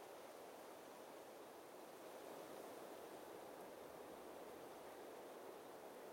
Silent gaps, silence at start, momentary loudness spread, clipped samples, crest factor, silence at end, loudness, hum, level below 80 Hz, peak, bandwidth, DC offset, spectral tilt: none; 0 s; 3 LU; under 0.1%; 14 dB; 0 s; -57 LUFS; none; -88 dBFS; -42 dBFS; 16.5 kHz; under 0.1%; -3.5 dB/octave